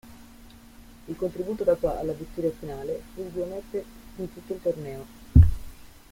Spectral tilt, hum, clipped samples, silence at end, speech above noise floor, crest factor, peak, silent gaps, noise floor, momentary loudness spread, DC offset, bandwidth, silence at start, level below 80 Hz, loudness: -9 dB/octave; none; under 0.1%; 0.15 s; 19 dB; 24 dB; -2 dBFS; none; -49 dBFS; 18 LU; under 0.1%; 16 kHz; 0.05 s; -34 dBFS; -27 LUFS